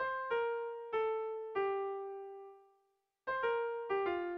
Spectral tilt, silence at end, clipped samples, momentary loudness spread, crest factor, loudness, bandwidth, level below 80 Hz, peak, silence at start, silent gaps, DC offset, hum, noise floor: -1.5 dB/octave; 0 s; under 0.1%; 12 LU; 14 dB; -38 LUFS; 5.4 kHz; -76 dBFS; -24 dBFS; 0 s; none; under 0.1%; none; -80 dBFS